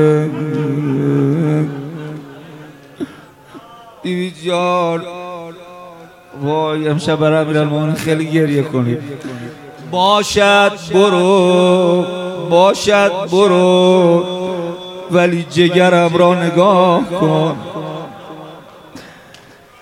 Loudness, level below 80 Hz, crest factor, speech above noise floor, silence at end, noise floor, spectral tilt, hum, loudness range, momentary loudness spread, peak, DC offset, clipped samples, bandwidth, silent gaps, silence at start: -13 LUFS; -52 dBFS; 14 dB; 29 dB; 0.7 s; -41 dBFS; -6 dB/octave; none; 10 LU; 19 LU; 0 dBFS; under 0.1%; under 0.1%; 15.5 kHz; none; 0 s